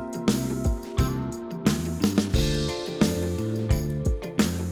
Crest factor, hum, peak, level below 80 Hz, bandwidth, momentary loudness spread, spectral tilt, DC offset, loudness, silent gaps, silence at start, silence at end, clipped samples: 18 dB; none; -8 dBFS; -32 dBFS; over 20 kHz; 4 LU; -5.5 dB/octave; under 0.1%; -26 LUFS; none; 0 s; 0 s; under 0.1%